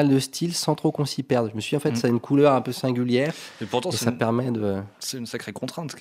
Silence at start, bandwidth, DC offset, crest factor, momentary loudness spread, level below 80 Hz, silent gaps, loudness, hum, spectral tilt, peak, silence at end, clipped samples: 0 s; 16 kHz; under 0.1%; 20 dB; 12 LU; -66 dBFS; none; -24 LUFS; none; -5.5 dB/octave; -4 dBFS; 0 s; under 0.1%